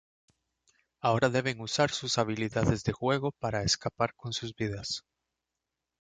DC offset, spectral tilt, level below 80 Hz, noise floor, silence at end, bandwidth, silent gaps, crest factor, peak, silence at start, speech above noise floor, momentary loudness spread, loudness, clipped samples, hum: under 0.1%; -4.5 dB/octave; -54 dBFS; -87 dBFS; 1 s; 9.6 kHz; none; 20 dB; -10 dBFS; 1.05 s; 57 dB; 8 LU; -30 LUFS; under 0.1%; none